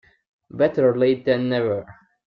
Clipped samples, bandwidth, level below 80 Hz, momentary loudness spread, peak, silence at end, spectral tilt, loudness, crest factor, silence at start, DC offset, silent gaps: under 0.1%; 5.4 kHz; -60 dBFS; 9 LU; -6 dBFS; 0.35 s; -9 dB/octave; -21 LUFS; 16 dB; 0.55 s; under 0.1%; none